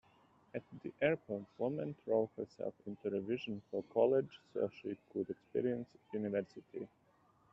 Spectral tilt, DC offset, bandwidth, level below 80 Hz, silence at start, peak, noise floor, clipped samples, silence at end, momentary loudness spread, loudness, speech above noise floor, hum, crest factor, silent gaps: -6 dB/octave; under 0.1%; 7.4 kHz; -78 dBFS; 0.55 s; -18 dBFS; -71 dBFS; under 0.1%; 0.65 s; 14 LU; -40 LUFS; 32 dB; none; 20 dB; none